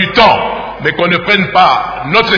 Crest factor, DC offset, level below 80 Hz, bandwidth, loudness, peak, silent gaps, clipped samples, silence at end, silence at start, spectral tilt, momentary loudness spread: 10 dB; under 0.1%; -38 dBFS; 5.4 kHz; -10 LUFS; 0 dBFS; none; 0.9%; 0 s; 0 s; -5.5 dB/octave; 8 LU